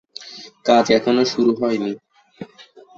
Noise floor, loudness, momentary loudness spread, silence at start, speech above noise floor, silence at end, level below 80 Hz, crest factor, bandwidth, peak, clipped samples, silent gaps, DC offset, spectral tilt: -39 dBFS; -18 LUFS; 23 LU; 0.2 s; 21 dB; 0.35 s; -62 dBFS; 18 dB; 7.8 kHz; -2 dBFS; under 0.1%; none; under 0.1%; -4.5 dB/octave